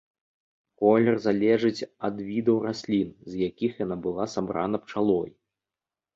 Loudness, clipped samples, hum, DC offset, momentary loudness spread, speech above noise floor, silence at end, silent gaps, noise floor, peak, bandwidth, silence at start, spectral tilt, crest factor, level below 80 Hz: -26 LUFS; under 0.1%; none; under 0.1%; 9 LU; over 65 dB; 0.85 s; none; under -90 dBFS; -6 dBFS; 7.6 kHz; 0.8 s; -7 dB/octave; 20 dB; -62 dBFS